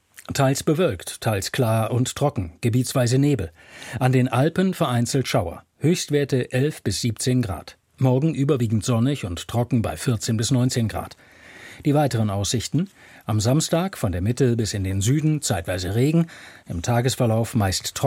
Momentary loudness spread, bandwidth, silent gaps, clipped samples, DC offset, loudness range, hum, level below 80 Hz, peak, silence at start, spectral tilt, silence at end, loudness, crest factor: 8 LU; 16.5 kHz; none; under 0.1%; under 0.1%; 2 LU; none; -48 dBFS; -6 dBFS; 0.2 s; -5.5 dB/octave; 0 s; -22 LUFS; 16 dB